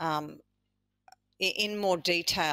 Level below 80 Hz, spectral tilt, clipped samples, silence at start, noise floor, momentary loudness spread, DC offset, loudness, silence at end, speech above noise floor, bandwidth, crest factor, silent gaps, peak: -64 dBFS; -3 dB/octave; under 0.1%; 0 s; -80 dBFS; 7 LU; under 0.1%; -29 LUFS; 0 s; 50 dB; 16 kHz; 18 dB; none; -14 dBFS